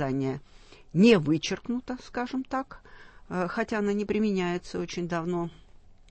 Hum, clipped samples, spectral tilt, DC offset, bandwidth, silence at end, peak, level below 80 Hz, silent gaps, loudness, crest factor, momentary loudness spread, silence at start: none; under 0.1%; -6 dB/octave; under 0.1%; 8.6 kHz; 0.15 s; -8 dBFS; -54 dBFS; none; -28 LUFS; 20 dB; 13 LU; 0 s